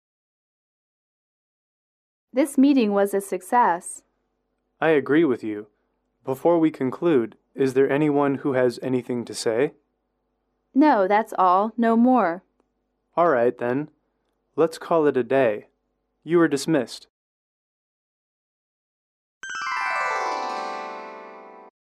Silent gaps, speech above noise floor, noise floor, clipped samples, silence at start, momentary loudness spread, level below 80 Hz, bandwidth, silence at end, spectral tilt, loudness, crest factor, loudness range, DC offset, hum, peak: 17.10-19.41 s; 53 dB; -74 dBFS; under 0.1%; 2.35 s; 16 LU; -74 dBFS; 14 kHz; 0.2 s; -6 dB/octave; -22 LUFS; 16 dB; 8 LU; under 0.1%; none; -8 dBFS